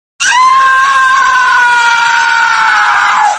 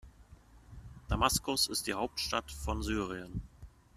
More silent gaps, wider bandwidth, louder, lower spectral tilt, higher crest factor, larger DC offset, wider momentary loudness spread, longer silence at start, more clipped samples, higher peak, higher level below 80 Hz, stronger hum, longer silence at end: neither; second, 13 kHz vs 15 kHz; first, -7 LUFS vs -33 LUFS; second, 2 dB/octave vs -3 dB/octave; second, 8 dB vs 24 dB; neither; second, 2 LU vs 23 LU; first, 0.2 s vs 0.05 s; first, 0.1% vs under 0.1%; first, 0 dBFS vs -12 dBFS; about the same, -50 dBFS vs -46 dBFS; neither; second, 0 s vs 0.25 s